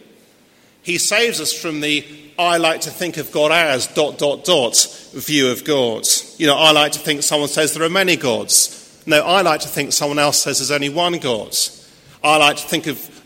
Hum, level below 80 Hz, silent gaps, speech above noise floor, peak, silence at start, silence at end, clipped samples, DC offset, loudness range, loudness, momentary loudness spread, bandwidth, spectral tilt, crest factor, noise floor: none; -60 dBFS; none; 35 dB; 0 dBFS; 0.85 s; 0.05 s; under 0.1%; under 0.1%; 3 LU; -16 LUFS; 9 LU; 16.5 kHz; -2 dB/octave; 18 dB; -52 dBFS